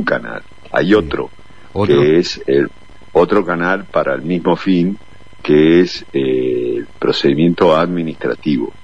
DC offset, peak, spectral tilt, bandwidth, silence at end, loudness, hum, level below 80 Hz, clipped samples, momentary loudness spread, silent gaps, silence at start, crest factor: 2%; 0 dBFS; -7 dB/octave; 8 kHz; 0.15 s; -15 LUFS; none; -44 dBFS; under 0.1%; 11 LU; none; 0 s; 14 dB